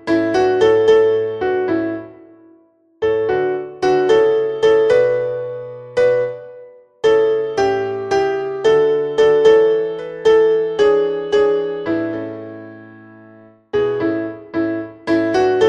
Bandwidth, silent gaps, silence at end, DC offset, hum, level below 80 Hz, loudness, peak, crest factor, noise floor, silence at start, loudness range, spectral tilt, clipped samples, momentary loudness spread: 7.6 kHz; none; 0 s; under 0.1%; none; -52 dBFS; -16 LUFS; -2 dBFS; 16 dB; -53 dBFS; 0.05 s; 6 LU; -5.5 dB/octave; under 0.1%; 12 LU